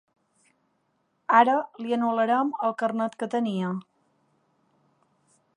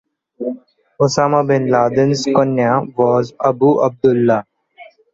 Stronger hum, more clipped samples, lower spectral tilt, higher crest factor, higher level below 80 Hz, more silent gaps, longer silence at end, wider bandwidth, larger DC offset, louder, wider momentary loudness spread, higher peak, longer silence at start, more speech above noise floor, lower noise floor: neither; neither; about the same, -6.5 dB/octave vs -6.5 dB/octave; first, 24 dB vs 14 dB; second, -82 dBFS vs -56 dBFS; neither; first, 1.75 s vs 0.3 s; first, 10.5 kHz vs 8 kHz; neither; second, -25 LUFS vs -15 LUFS; about the same, 11 LU vs 12 LU; about the same, -4 dBFS vs -2 dBFS; first, 1.3 s vs 0.4 s; first, 48 dB vs 29 dB; first, -72 dBFS vs -43 dBFS